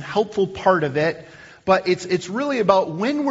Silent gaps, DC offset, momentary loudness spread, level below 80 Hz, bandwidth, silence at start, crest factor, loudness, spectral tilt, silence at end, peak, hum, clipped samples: none; under 0.1%; 6 LU; -58 dBFS; 8 kHz; 0 s; 20 dB; -20 LUFS; -4.5 dB/octave; 0 s; 0 dBFS; none; under 0.1%